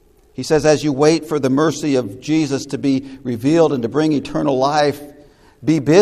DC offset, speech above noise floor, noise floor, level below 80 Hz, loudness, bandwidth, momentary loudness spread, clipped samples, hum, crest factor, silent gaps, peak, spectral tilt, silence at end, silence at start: under 0.1%; 30 dB; -46 dBFS; -50 dBFS; -17 LUFS; 14 kHz; 7 LU; under 0.1%; none; 16 dB; none; 0 dBFS; -6 dB/octave; 0 s; 0.4 s